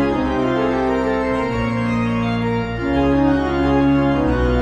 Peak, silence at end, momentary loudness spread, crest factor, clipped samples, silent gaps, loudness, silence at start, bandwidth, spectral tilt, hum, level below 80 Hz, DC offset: -6 dBFS; 0 s; 4 LU; 12 dB; under 0.1%; none; -18 LUFS; 0 s; 8.4 kHz; -8 dB/octave; none; -30 dBFS; under 0.1%